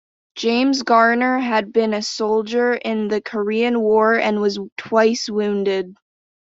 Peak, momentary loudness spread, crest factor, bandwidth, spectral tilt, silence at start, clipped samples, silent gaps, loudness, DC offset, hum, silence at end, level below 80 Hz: -2 dBFS; 7 LU; 16 dB; 7.8 kHz; -4.5 dB/octave; 0.35 s; under 0.1%; 4.72-4.76 s; -18 LUFS; under 0.1%; none; 0.55 s; -64 dBFS